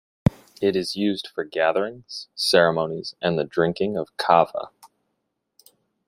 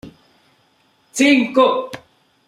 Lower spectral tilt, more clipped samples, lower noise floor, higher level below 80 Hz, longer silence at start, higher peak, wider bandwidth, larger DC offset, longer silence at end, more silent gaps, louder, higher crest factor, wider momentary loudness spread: first, -5 dB/octave vs -3 dB/octave; neither; first, -77 dBFS vs -59 dBFS; first, -52 dBFS vs -62 dBFS; first, 0.25 s vs 0.05 s; about the same, -2 dBFS vs -2 dBFS; first, 16 kHz vs 14 kHz; neither; first, 1.2 s vs 0.5 s; neither; second, -23 LUFS vs -15 LUFS; about the same, 22 dB vs 18 dB; second, 11 LU vs 19 LU